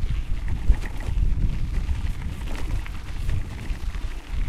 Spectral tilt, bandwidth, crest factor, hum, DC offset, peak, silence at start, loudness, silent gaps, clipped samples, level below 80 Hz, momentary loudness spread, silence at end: -6 dB/octave; 12 kHz; 18 dB; none; under 0.1%; -6 dBFS; 0 s; -30 LUFS; none; under 0.1%; -26 dBFS; 7 LU; 0 s